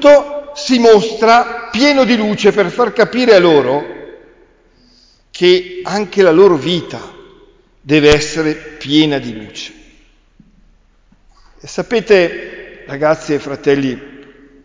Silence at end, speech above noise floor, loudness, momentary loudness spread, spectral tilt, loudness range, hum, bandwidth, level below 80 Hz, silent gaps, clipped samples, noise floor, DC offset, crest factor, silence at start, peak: 0.6 s; 39 dB; -12 LUFS; 19 LU; -5 dB/octave; 8 LU; none; 7.6 kHz; -42 dBFS; none; under 0.1%; -50 dBFS; under 0.1%; 14 dB; 0 s; 0 dBFS